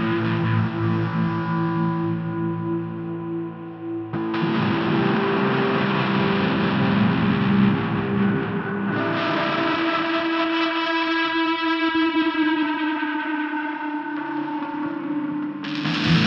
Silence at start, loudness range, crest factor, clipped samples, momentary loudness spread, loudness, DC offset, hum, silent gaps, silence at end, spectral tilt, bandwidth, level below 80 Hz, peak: 0 s; 5 LU; 16 dB; under 0.1%; 8 LU; -22 LUFS; under 0.1%; none; none; 0 s; -7.5 dB/octave; 6.8 kHz; -54 dBFS; -6 dBFS